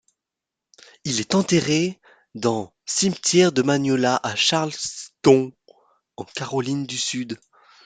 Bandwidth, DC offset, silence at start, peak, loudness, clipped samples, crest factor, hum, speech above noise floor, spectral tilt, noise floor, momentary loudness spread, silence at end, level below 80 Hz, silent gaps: 9.6 kHz; under 0.1%; 1.05 s; -2 dBFS; -21 LUFS; under 0.1%; 20 dB; none; 65 dB; -4 dB/octave; -86 dBFS; 15 LU; 0.5 s; -62 dBFS; none